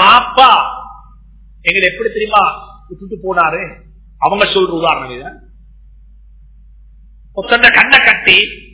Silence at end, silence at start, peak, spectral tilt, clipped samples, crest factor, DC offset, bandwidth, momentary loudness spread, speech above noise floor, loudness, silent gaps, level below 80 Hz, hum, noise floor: 0.15 s; 0 s; 0 dBFS; -6.5 dB/octave; 1%; 14 dB; under 0.1%; 4 kHz; 21 LU; 28 dB; -10 LUFS; none; -40 dBFS; none; -40 dBFS